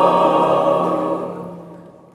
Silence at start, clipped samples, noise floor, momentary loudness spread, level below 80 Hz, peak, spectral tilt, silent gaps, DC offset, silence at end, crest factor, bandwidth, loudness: 0 s; under 0.1%; -40 dBFS; 18 LU; -62 dBFS; -2 dBFS; -7 dB/octave; none; under 0.1%; 0.25 s; 16 dB; 12.5 kHz; -17 LUFS